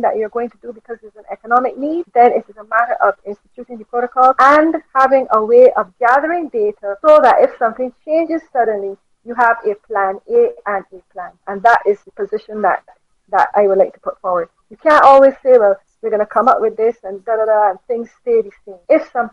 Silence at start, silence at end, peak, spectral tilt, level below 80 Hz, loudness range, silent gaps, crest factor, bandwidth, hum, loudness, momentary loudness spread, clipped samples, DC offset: 0 s; 0.05 s; 0 dBFS; -5.5 dB/octave; -56 dBFS; 5 LU; none; 14 dB; 8.4 kHz; none; -14 LUFS; 18 LU; under 0.1%; under 0.1%